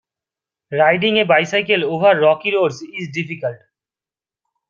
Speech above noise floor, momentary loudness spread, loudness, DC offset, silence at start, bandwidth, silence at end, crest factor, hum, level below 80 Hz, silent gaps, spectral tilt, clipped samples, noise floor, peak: over 74 dB; 12 LU; -16 LUFS; under 0.1%; 0.7 s; 7.4 kHz; 1.15 s; 16 dB; none; -64 dBFS; none; -5 dB/octave; under 0.1%; under -90 dBFS; -2 dBFS